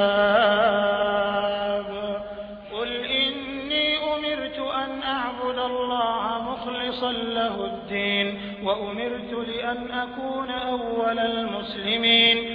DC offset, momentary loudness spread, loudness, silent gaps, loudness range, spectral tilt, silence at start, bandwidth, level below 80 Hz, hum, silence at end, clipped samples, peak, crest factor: under 0.1%; 11 LU; -24 LUFS; none; 4 LU; -6.5 dB/octave; 0 s; 5.2 kHz; -54 dBFS; none; 0 s; under 0.1%; -8 dBFS; 18 dB